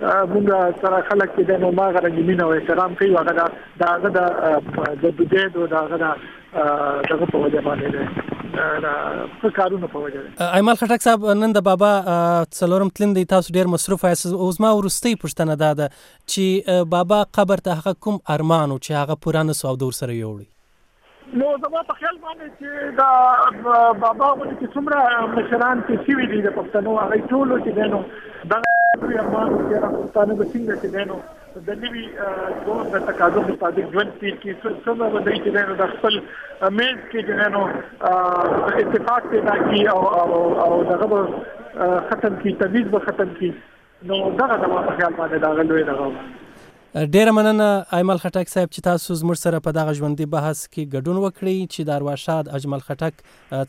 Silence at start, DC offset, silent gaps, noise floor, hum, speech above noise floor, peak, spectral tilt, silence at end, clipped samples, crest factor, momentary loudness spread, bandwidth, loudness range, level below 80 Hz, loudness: 0 s; under 0.1%; none; -57 dBFS; none; 38 dB; -2 dBFS; -5.5 dB/octave; 0 s; under 0.1%; 18 dB; 10 LU; 16 kHz; 5 LU; -54 dBFS; -19 LUFS